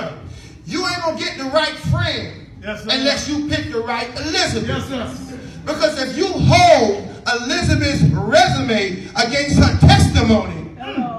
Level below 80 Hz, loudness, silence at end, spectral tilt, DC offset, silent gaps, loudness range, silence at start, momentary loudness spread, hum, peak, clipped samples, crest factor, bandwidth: -32 dBFS; -16 LUFS; 0 s; -5 dB/octave; under 0.1%; none; 6 LU; 0 s; 17 LU; none; 0 dBFS; under 0.1%; 16 dB; 12.5 kHz